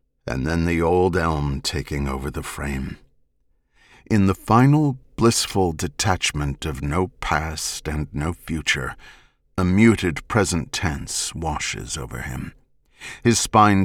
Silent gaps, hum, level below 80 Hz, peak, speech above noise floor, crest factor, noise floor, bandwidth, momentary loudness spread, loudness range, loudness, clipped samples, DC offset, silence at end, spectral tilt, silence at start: none; none; -36 dBFS; -4 dBFS; 44 dB; 18 dB; -65 dBFS; 18 kHz; 14 LU; 5 LU; -22 LUFS; under 0.1%; under 0.1%; 0 s; -5 dB/octave; 0.25 s